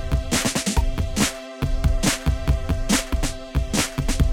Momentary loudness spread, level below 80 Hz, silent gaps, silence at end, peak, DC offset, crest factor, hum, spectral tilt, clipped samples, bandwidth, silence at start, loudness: 5 LU; -24 dBFS; none; 0 s; -6 dBFS; under 0.1%; 16 dB; none; -4 dB/octave; under 0.1%; 17 kHz; 0 s; -23 LUFS